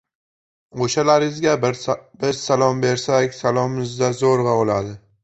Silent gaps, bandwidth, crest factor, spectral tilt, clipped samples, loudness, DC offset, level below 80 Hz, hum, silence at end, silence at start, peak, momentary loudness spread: none; 8.2 kHz; 18 dB; -5 dB/octave; under 0.1%; -19 LUFS; under 0.1%; -54 dBFS; none; 0.25 s; 0.75 s; -2 dBFS; 8 LU